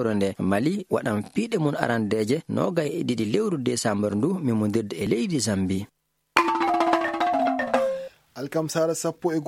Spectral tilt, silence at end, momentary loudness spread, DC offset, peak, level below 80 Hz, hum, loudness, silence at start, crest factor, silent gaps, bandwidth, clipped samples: -5.5 dB/octave; 0 s; 5 LU; under 0.1%; 0 dBFS; -62 dBFS; none; -25 LUFS; 0 s; 24 dB; none; 16.5 kHz; under 0.1%